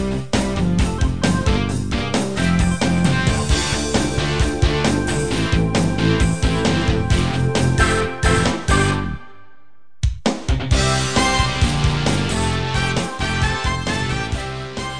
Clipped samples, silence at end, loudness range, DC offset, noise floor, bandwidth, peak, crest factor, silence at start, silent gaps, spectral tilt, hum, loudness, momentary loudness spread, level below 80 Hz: under 0.1%; 0 s; 2 LU; 2%; -58 dBFS; 10 kHz; -2 dBFS; 16 dB; 0 s; none; -5 dB/octave; none; -19 LUFS; 5 LU; -26 dBFS